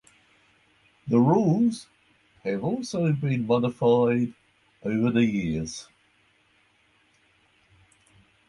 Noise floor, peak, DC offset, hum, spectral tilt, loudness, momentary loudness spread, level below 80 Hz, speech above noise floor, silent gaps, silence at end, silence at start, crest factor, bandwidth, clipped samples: -64 dBFS; -8 dBFS; under 0.1%; none; -7.5 dB/octave; -25 LUFS; 15 LU; -58 dBFS; 41 dB; none; 2.65 s; 1.05 s; 18 dB; 11 kHz; under 0.1%